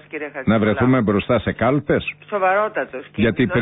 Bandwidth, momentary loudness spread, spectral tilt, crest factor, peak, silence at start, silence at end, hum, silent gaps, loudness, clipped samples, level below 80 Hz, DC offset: 4 kHz; 9 LU; -12 dB/octave; 14 dB; -6 dBFS; 0.15 s; 0 s; none; none; -19 LUFS; under 0.1%; -42 dBFS; under 0.1%